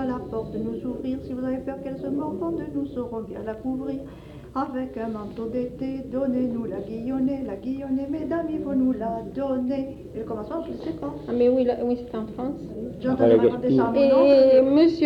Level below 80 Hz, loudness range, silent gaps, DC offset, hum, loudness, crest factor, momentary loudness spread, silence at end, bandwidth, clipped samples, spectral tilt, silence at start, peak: -50 dBFS; 10 LU; none; under 0.1%; none; -25 LUFS; 16 dB; 15 LU; 0 s; 6 kHz; under 0.1%; -8.5 dB/octave; 0 s; -8 dBFS